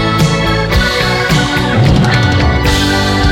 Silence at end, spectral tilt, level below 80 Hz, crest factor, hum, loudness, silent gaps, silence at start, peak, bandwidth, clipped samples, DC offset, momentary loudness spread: 0 s; -5 dB/octave; -20 dBFS; 10 dB; none; -11 LUFS; none; 0 s; -2 dBFS; 17 kHz; under 0.1%; under 0.1%; 2 LU